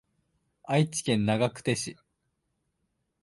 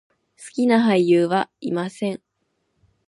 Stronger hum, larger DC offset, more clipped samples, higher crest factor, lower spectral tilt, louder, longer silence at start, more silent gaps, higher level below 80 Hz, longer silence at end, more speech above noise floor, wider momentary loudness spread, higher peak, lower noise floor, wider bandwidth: neither; neither; neither; about the same, 20 dB vs 16 dB; second, -5 dB/octave vs -6.5 dB/octave; second, -28 LUFS vs -20 LUFS; first, 0.65 s vs 0.4 s; neither; first, -64 dBFS vs -70 dBFS; first, 1.3 s vs 0.9 s; about the same, 51 dB vs 52 dB; second, 5 LU vs 12 LU; second, -12 dBFS vs -6 dBFS; first, -78 dBFS vs -72 dBFS; about the same, 11.5 kHz vs 11.5 kHz